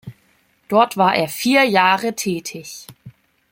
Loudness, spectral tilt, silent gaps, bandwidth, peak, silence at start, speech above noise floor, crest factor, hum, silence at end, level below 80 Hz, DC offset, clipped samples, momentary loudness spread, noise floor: -17 LUFS; -4 dB/octave; none; 16.5 kHz; 0 dBFS; 0.05 s; 42 dB; 18 dB; none; 0.4 s; -62 dBFS; under 0.1%; under 0.1%; 18 LU; -60 dBFS